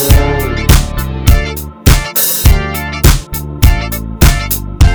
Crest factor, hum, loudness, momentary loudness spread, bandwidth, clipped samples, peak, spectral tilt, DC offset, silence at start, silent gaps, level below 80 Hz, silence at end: 10 dB; none; -12 LUFS; 7 LU; over 20 kHz; 2%; 0 dBFS; -4.5 dB/octave; under 0.1%; 0 s; none; -12 dBFS; 0 s